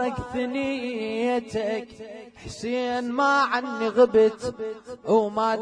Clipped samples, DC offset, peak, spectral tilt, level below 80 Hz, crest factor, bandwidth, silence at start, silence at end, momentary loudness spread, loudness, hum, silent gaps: under 0.1%; under 0.1%; -8 dBFS; -5 dB/octave; -54 dBFS; 18 dB; 10.5 kHz; 0 s; 0 s; 16 LU; -24 LUFS; none; none